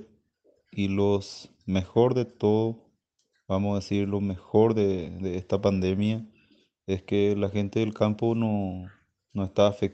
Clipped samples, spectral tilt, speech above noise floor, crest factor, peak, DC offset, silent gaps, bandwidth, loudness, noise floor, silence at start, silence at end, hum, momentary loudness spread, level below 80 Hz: under 0.1%; -7.5 dB/octave; 50 dB; 20 dB; -6 dBFS; under 0.1%; none; 8.2 kHz; -27 LUFS; -75 dBFS; 0 s; 0 s; none; 11 LU; -60 dBFS